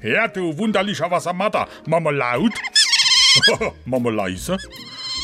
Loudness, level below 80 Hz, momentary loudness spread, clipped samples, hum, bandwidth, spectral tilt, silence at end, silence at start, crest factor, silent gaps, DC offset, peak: -17 LUFS; -48 dBFS; 15 LU; under 0.1%; none; 16 kHz; -2.5 dB/octave; 0 s; 0 s; 18 dB; none; under 0.1%; -2 dBFS